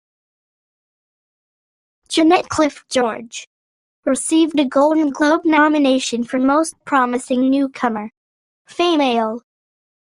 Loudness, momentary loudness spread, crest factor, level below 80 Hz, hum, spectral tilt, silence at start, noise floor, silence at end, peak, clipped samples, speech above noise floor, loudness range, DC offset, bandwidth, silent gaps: -17 LUFS; 12 LU; 16 dB; -60 dBFS; none; -3 dB/octave; 2.1 s; under -90 dBFS; 0.65 s; -2 dBFS; under 0.1%; over 74 dB; 5 LU; under 0.1%; 11 kHz; 3.47-4.03 s, 8.17-8.65 s